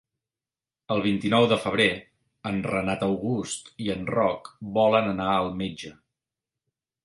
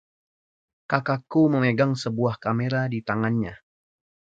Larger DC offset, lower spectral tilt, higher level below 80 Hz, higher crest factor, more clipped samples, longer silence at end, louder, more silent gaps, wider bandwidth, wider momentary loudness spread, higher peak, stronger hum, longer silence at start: neither; second, -5 dB/octave vs -7.5 dB/octave; about the same, -56 dBFS vs -60 dBFS; about the same, 20 dB vs 22 dB; neither; first, 1.1 s vs 0.8 s; about the same, -25 LUFS vs -24 LUFS; neither; first, 11.5 kHz vs 7.8 kHz; first, 12 LU vs 6 LU; about the same, -6 dBFS vs -4 dBFS; neither; about the same, 0.9 s vs 0.9 s